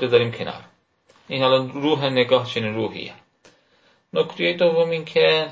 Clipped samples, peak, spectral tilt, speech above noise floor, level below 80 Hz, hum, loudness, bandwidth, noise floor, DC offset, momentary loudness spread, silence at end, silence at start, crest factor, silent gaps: under 0.1%; -4 dBFS; -6 dB/octave; 40 dB; -64 dBFS; none; -21 LUFS; 7.6 kHz; -60 dBFS; under 0.1%; 13 LU; 0 s; 0 s; 18 dB; none